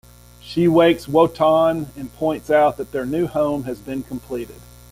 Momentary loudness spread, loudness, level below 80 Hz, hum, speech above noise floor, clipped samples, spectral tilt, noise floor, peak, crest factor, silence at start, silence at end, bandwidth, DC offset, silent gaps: 13 LU; -19 LUFS; -48 dBFS; none; 22 dB; under 0.1%; -6.5 dB/octave; -41 dBFS; -2 dBFS; 16 dB; 0.45 s; 0.3 s; 16 kHz; under 0.1%; none